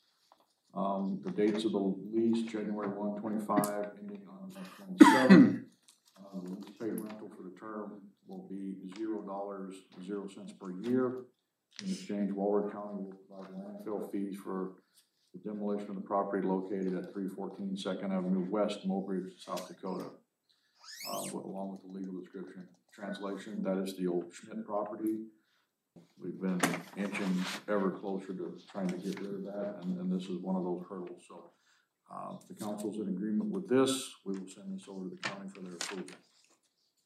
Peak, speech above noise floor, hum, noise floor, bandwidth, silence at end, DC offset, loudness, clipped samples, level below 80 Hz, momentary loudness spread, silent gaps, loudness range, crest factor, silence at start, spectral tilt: -4 dBFS; 44 dB; none; -77 dBFS; 14.5 kHz; 0.9 s; under 0.1%; -34 LUFS; under 0.1%; under -90 dBFS; 15 LU; none; 15 LU; 30 dB; 0.75 s; -6 dB/octave